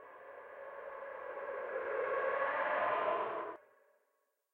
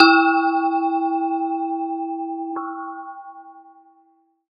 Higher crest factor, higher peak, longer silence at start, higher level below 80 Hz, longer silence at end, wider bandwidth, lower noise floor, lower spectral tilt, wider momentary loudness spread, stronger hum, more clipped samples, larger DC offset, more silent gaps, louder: second, 16 dB vs 22 dB; second, -22 dBFS vs 0 dBFS; about the same, 0 s vs 0 s; first, -82 dBFS vs under -90 dBFS; about the same, 0.95 s vs 0.9 s; about the same, 4.7 kHz vs 5 kHz; first, -81 dBFS vs -60 dBFS; first, -5.5 dB/octave vs 1.5 dB/octave; about the same, 17 LU vs 19 LU; neither; neither; neither; neither; second, -38 LUFS vs -21 LUFS